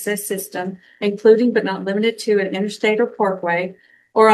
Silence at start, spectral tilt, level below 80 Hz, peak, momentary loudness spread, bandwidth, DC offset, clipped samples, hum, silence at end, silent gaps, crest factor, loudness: 0 s; -4.5 dB/octave; -70 dBFS; 0 dBFS; 11 LU; 13 kHz; under 0.1%; under 0.1%; none; 0 s; none; 18 dB; -19 LUFS